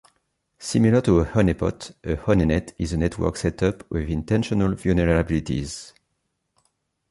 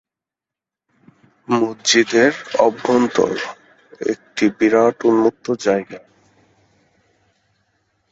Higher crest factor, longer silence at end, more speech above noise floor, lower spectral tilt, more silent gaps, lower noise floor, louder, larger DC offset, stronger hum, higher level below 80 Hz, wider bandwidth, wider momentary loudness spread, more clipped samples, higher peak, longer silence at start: about the same, 18 dB vs 18 dB; second, 1.2 s vs 2.15 s; second, 54 dB vs 71 dB; first, -7 dB/octave vs -3.5 dB/octave; neither; second, -75 dBFS vs -87 dBFS; second, -22 LUFS vs -17 LUFS; neither; neither; first, -36 dBFS vs -62 dBFS; first, 11.5 kHz vs 8 kHz; about the same, 10 LU vs 11 LU; neither; second, -6 dBFS vs -2 dBFS; second, 0.6 s vs 1.5 s